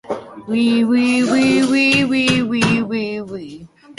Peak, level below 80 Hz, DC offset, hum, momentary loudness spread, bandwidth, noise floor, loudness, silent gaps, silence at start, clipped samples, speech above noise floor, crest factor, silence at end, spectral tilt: -2 dBFS; -52 dBFS; under 0.1%; none; 15 LU; 11.5 kHz; -38 dBFS; -15 LUFS; none; 0.1 s; under 0.1%; 23 dB; 14 dB; 0.05 s; -4.5 dB/octave